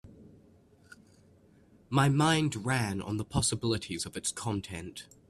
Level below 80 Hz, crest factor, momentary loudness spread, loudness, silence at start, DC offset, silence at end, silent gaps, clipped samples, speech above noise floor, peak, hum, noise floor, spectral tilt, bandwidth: -56 dBFS; 20 dB; 11 LU; -30 LUFS; 0.05 s; under 0.1%; 0.25 s; none; under 0.1%; 31 dB; -12 dBFS; none; -61 dBFS; -4.5 dB/octave; 13.5 kHz